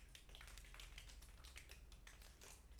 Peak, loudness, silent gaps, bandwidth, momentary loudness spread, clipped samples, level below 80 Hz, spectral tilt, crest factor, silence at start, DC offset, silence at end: -40 dBFS; -61 LUFS; none; over 20 kHz; 4 LU; under 0.1%; -62 dBFS; -2 dB/octave; 20 dB; 0 s; under 0.1%; 0 s